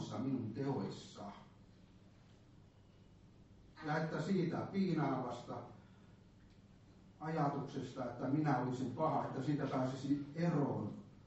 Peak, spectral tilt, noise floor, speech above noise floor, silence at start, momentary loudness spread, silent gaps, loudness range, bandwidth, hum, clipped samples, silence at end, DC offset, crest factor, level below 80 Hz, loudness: -24 dBFS; -7 dB/octave; -63 dBFS; 25 dB; 0 s; 13 LU; none; 9 LU; 8 kHz; none; under 0.1%; 0 s; under 0.1%; 18 dB; -70 dBFS; -40 LUFS